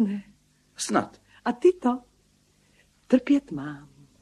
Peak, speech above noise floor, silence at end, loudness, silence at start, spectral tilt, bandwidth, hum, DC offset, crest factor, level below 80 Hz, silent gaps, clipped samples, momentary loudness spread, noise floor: -8 dBFS; 40 dB; 0.4 s; -26 LUFS; 0 s; -5 dB/octave; 12.5 kHz; none; under 0.1%; 20 dB; -64 dBFS; none; under 0.1%; 15 LU; -64 dBFS